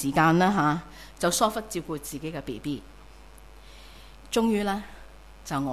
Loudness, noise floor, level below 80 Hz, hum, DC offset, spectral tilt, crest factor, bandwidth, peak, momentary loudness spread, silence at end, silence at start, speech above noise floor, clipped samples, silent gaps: -27 LUFS; -49 dBFS; -50 dBFS; none; 0.2%; -4.5 dB/octave; 18 dB; 16 kHz; -10 dBFS; 23 LU; 0 s; 0 s; 23 dB; under 0.1%; none